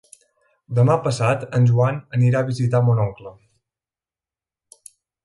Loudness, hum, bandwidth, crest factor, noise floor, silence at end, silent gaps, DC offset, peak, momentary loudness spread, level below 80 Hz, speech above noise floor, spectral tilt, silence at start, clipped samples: -19 LUFS; none; 11.5 kHz; 16 dB; under -90 dBFS; 1.95 s; none; under 0.1%; -4 dBFS; 6 LU; -54 dBFS; over 72 dB; -7.5 dB/octave; 0.7 s; under 0.1%